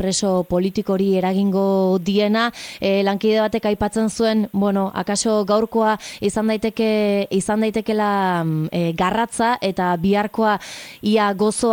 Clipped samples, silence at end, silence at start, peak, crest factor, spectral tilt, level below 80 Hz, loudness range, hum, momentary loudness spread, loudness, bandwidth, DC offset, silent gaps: under 0.1%; 0 s; 0 s; -6 dBFS; 12 dB; -5 dB/octave; -50 dBFS; 1 LU; none; 3 LU; -19 LUFS; 17.5 kHz; under 0.1%; none